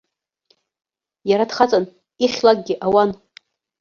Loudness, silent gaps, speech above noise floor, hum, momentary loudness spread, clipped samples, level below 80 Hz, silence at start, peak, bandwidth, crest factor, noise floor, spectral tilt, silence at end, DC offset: -18 LUFS; none; 47 dB; none; 12 LU; under 0.1%; -60 dBFS; 1.25 s; -2 dBFS; 7.2 kHz; 18 dB; -64 dBFS; -5 dB/octave; 0.65 s; under 0.1%